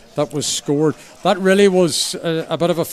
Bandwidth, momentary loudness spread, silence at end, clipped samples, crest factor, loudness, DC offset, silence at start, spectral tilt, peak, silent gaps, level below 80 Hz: 15.5 kHz; 9 LU; 0 s; under 0.1%; 16 dB; -17 LUFS; under 0.1%; 0.15 s; -4 dB/octave; -2 dBFS; none; -56 dBFS